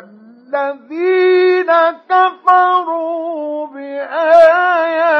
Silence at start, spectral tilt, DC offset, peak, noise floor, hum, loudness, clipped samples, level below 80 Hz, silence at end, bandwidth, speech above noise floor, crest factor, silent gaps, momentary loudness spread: 0.5 s; -4 dB/octave; under 0.1%; 0 dBFS; -41 dBFS; none; -13 LUFS; under 0.1%; -68 dBFS; 0 s; 6.2 kHz; 29 dB; 12 dB; none; 14 LU